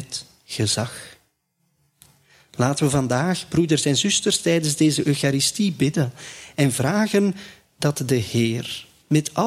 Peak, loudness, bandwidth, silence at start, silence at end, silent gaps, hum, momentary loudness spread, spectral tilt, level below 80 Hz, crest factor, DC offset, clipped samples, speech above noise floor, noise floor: -4 dBFS; -21 LUFS; 15.5 kHz; 0 s; 0 s; none; none; 13 LU; -4.5 dB/octave; -56 dBFS; 18 dB; under 0.1%; under 0.1%; 49 dB; -70 dBFS